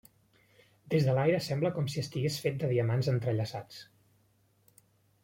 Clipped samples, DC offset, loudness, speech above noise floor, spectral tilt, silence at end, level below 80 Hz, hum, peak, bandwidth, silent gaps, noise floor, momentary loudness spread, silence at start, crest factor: under 0.1%; under 0.1%; -31 LUFS; 39 dB; -6.5 dB/octave; 1.4 s; -66 dBFS; none; -16 dBFS; 16.5 kHz; none; -69 dBFS; 10 LU; 0.85 s; 18 dB